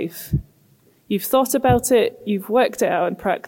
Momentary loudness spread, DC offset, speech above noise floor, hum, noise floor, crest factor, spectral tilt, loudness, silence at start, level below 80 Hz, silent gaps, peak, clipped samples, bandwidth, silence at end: 10 LU; under 0.1%; 37 dB; none; -56 dBFS; 16 dB; -5 dB/octave; -20 LUFS; 0 s; -42 dBFS; none; -4 dBFS; under 0.1%; 17 kHz; 0.1 s